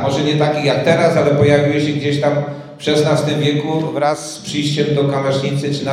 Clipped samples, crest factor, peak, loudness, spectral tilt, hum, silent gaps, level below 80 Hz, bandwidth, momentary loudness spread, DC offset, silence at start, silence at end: under 0.1%; 14 dB; 0 dBFS; -16 LUFS; -6 dB/octave; none; none; -52 dBFS; 13 kHz; 7 LU; under 0.1%; 0 s; 0 s